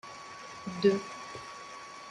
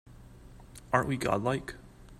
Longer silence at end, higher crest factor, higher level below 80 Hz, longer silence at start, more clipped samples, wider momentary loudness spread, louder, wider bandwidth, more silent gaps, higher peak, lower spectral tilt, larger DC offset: about the same, 0 s vs 0.05 s; about the same, 22 dB vs 24 dB; second, -72 dBFS vs -54 dBFS; about the same, 0.05 s vs 0.05 s; neither; second, 17 LU vs 22 LU; about the same, -33 LUFS vs -31 LUFS; second, 10.5 kHz vs 15 kHz; neither; second, -14 dBFS vs -10 dBFS; about the same, -5.5 dB/octave vs -6 dB/octave; neither